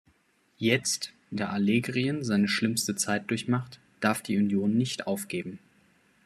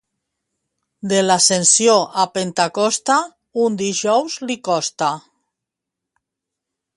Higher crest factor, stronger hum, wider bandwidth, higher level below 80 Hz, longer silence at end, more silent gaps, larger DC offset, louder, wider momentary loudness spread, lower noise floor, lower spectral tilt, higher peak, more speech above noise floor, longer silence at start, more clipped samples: about the same, 22 dB vs 18 dB; neither; first, 14 kHz vs 11.5 kHz; about the same, -70 dBFS vs -68 dBFS; second, 0.7 s vs 1.75 s; neither; neither; second, -28 LUFS vs -17 LUFS; second, 8 LU vs 11 LU; second, -67 dBFS vs -83 dBFS; first, -4.5 dB/octave vs -2.5 dB/octave; second, -8 dBFS vs 0 dBFS; second, 40 dB vs 66 dB; second, 0.6 s vs 1.05 s; neither